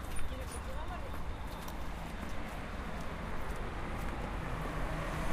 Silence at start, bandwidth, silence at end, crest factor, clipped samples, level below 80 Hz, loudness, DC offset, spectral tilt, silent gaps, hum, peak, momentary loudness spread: 0 s; 15.5 kHz; 0 s; 16 dB; under 0.1%; -42 dBFS; -41 LUFS; under 0.1%; -5.5 dB/octave; none; none; -22 dBFS; 5 LU